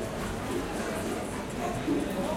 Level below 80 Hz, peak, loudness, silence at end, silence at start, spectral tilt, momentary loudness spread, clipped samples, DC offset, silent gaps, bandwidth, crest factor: -46 dBFS; -18 dBFS; -32 LUFS; 0 s; 0 s; -5 dB/octave; 4 LU; under 0.1%; under 0.1%; none; 16.5 kHz; 14 dB